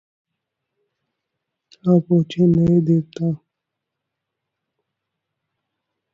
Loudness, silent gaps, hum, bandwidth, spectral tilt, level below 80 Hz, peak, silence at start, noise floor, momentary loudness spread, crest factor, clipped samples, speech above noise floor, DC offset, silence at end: -18 LUFS; none; none; 6.6 kHz; -10 dB/octave; -54 dBFS; -4 dBFS; 1.85 s; -81 dBFS; 9 LU; 18 dB; under 0.1%; 65 dB; under 0.1%; 2.75 s